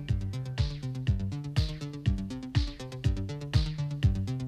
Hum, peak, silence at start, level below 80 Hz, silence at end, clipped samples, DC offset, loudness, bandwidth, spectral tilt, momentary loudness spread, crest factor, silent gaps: none; -12 dBFS; 0 s; -36 dBFS; 0 s; under 0.1%; under 0.1%; -32 LUFS; 11 kHz; -6.5 dB/octave; 6 LU; 18 dB; none